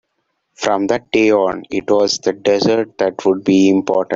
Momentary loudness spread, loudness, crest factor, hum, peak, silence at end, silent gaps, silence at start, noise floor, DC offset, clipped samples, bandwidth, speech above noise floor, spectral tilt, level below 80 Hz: 6 LU; -15 LUFS; 14 dB; none; 0 dBFS; 0 s; none; 0.6 s; -70 dBFS; under 0.1%; under 0.1%; 7.8 kHz; 55 dB; -5 dB/octave; -56 dBFS